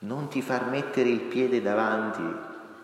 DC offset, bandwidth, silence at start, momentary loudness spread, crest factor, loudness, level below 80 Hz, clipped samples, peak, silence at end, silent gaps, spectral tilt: under 0.1%; 13.5 kHz; 0 s; 9 LU; 16 dB; -27 LUFS; -78 dBFS; under 0.1%; -12 dBFS; 0 s; none; -6 dB/octave